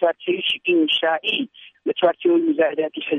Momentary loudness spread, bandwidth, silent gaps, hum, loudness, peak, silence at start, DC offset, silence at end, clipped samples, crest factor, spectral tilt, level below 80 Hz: 8 LU; 3.9 kHz; none; none; -20 LUFS; -6 dBFS; 0 s; under 0.1%; 0 s; under 0.1%; 16 dB; -5.5 dB/octave; -68 dBFS